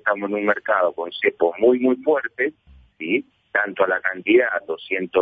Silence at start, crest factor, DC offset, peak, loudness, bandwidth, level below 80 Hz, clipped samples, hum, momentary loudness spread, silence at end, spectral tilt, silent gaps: 0.05 s; 16 dB; under 0.1%; -4 dBFS; -21 LUFS; 4.8 kHz; -62 dBFS; under 0.1%; none; 8 LU; 0 s; -7.5 dB/octave; none